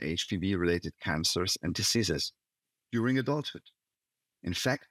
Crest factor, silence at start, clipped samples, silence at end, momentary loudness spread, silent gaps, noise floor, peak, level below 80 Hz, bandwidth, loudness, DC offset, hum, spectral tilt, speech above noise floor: 18 dB; 0 s; under 0.1%; 0.1 s; 9 LU; none; -89 dBFS; -14 dBFS; -60 dBFS; 16 kHz; -30 LUFS; under 0.1%; none; -4 dB/octave; 58 dB